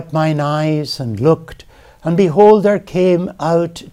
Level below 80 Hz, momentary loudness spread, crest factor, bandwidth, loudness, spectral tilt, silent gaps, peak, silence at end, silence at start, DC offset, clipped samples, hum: -48 dBFS; 10 LU; 14 dB; 13 kHz; -14 LUFS; -7.5 dB/octave; none; 0 dBFS; 0.05 s; 0 s; under 0.1%; under 0.1%; none